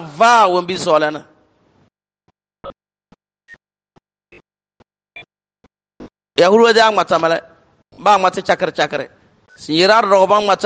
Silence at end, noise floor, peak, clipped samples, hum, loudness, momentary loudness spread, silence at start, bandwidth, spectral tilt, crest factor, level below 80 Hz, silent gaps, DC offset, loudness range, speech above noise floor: 0 s; -66 dBFS; 0 dBFS; under 0.1%; none; -14 LUFS; 22 LU; 0 s; 9.6 kHz; -4 dB/octave; 16 dB; -60 dBFS; none; under 0.1%; 9 LU; 53 dB